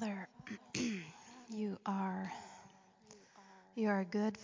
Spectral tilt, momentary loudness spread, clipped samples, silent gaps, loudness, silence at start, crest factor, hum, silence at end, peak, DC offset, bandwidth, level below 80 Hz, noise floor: -5.5 dB/octave; 24 LU; under 0.1%; none; -41 LUFS; 0 s; 18 dB; none; 0 s; -22 dBFS; under 0.1%; 7.6 kHz; -78 dBFS; -63 dBFS